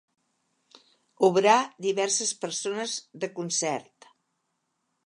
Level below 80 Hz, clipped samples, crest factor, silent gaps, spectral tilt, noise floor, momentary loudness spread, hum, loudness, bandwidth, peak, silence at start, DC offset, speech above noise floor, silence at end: -84 dBFS; under 0.1%; 24 dB; none; -2.5 dB/octave; -78 dBFS; 12 LU; none; -26 LUFS; 11.5 kHz; -6 dBFS; 1.2 s; under 0.1%; 52 dB; 1.25 s